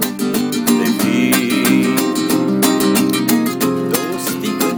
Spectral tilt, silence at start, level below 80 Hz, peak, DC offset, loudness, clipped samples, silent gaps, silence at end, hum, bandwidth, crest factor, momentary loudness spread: -4 dB/octave; 0 s; -56 dBFS; 0 dBFS; under 0.1%; -15 LUFS; under 0.1%; none; 0 s; none; 20 kHz; 16 dB; 5 LU